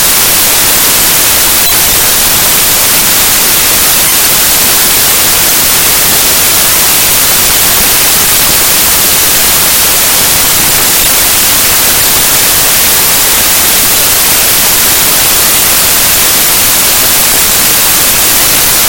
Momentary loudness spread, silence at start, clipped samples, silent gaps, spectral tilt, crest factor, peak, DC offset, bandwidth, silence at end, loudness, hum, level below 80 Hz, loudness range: 0 LU; 0 s; 4%; none; 0 dB/octave; 6 dB; 0 dBFS; 1%; over 20 kHz; 0 s; -3 LUFS; none; -28 dBFS; 0 LU